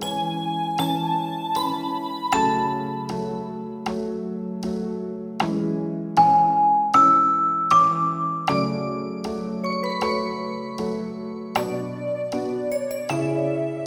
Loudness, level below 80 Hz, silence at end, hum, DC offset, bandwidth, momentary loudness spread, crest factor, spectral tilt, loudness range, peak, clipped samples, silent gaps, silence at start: -23 LUFS; -58 dBFS; 0 s; none; under 0.1%; over 20 kHz; 12 LU; 20 dB; -6 dB/octave; 9 LU; -4 dBFS; under 0.1%; none; 0 s